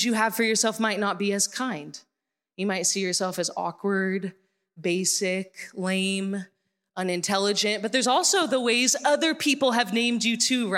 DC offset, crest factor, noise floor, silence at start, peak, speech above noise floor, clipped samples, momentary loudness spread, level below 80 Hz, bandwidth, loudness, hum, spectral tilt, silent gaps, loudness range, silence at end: under 0.1%; 18 dB; -79 dBFS; 0 s; -8 dBFS; 54 dB; under 0.1%; 11 LU; -82 dBFS; 16.5 kHz; -24 LUFS; none; -2.5 dB/octave; none; 6 LU; 0 s